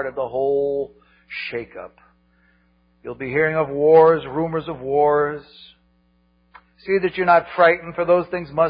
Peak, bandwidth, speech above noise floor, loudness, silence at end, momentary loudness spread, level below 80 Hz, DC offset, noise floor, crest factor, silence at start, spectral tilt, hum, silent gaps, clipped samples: -2 dBFS; 5.2 kHz; 42 dB; -19 LUFS; 0 s; 19 LU; -54 dBFS; under 0.1%; -61 dBFS; 18 dB; 0 s; -11 dB/octave; none; none; under 0.1%